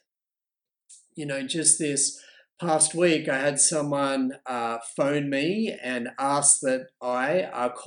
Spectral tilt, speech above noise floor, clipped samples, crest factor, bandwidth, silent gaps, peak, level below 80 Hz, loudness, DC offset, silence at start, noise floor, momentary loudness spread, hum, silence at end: -2.5 dB/octave; over 65 dB; under 0.1%; 22 dB; 11 kHz; none; -4 dBFS; -74 dBFS; -24 LUFS; under 0.1%; 0.9 s; under -90 dBFS; 11 LU; none; 0 s